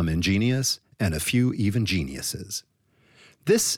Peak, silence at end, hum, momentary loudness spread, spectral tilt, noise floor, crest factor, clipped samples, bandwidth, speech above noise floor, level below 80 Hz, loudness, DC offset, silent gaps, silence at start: -8 dBFS; 0 s; none; 10 LU; -4.5 dB/octave; -60 dBFS; 16 dB; under 0.1%; 18.5 kHz; 36 dB; -44 dBFS; -25 LUFS; under 0.1%; none; 0 s